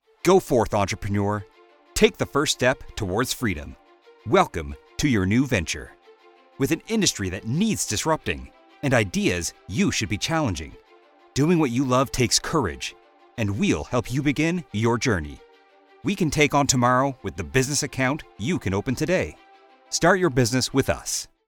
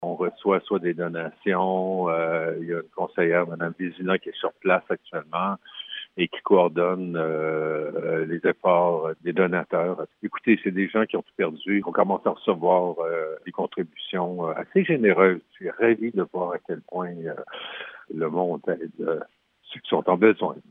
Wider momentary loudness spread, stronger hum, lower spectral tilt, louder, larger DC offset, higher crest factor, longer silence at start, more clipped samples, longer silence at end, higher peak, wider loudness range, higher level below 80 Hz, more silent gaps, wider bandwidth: about the same, 11 LU vs 12 LU; neither; second, -4.5 dB/octave vs -9.5 dB/octave; about the same, -23 LUFS vs -25 LUFS; neither; about the same, 20 dB vs 22 dB; first, 0.25 s vs 0 s; neither; about the same, 0.2 s vs 0.1 s; about the same, -2 dBFS vs -2 dBFS; about the same, 2 LU vs 4 LU; first, -44 dBFS vs -78 dBFS; neither; first, 19 kHz vs 3.9 kHz